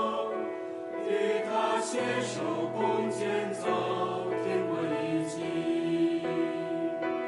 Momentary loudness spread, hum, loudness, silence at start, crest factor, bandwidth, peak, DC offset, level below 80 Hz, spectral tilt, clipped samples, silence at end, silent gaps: 4 LU; none; -31 LUFS; 0 s; 14 dB; 11.5 kHz; -16 dBFS; under 0.1%; -76 dBFS; -5 dB/octave; under 0.1%; 0 s; none